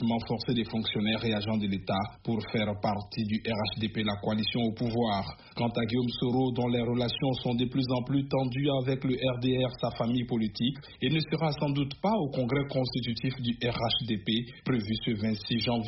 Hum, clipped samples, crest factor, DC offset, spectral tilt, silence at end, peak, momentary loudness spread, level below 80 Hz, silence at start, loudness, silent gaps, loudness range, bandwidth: none; under 0.1%; 14 dB; under 0.1%; -5 dB/octave; 0 s; -14 dBFS; 4 LU; -54 dBFS; 0 s; -30 LUFS; none; 2 LU; 6 kHz